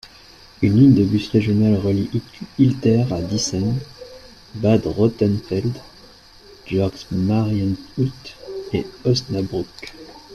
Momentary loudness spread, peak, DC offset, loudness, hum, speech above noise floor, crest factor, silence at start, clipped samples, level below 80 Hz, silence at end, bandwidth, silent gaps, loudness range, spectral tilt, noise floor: 17 LU; -2 dBFS; under 0.1%; -20 LUFS; none; 27 dB; 18 dB; 0.05 s; under 0.1%; -46 dBFS; 0 s; 12 kHz; none; 6 LU; -7 dB/octave; -46 dBFS